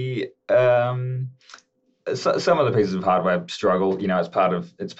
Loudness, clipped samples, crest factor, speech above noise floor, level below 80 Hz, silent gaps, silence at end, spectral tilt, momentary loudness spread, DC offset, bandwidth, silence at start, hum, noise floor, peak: -22 LUFS; under 0.1%; 16 dB; 29 dB; -70 dBFS; none; 0.05 s; -6.5 dB/octave; 11 LU; under 0.1%; 8.2 kHz; 0 s; none; -51 dBFS; -6 dBFS